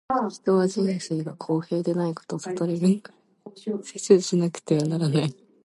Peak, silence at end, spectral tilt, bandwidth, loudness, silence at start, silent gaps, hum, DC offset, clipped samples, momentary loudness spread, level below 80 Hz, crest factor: -4 dBFS; 0.3 s; -6.5 dB/octave; 11.5 kHz; -25 LUFS; 0.1 s; none; none; under 0.1%; under 0.1%; 11 LU; -70 dBFS; 20 dB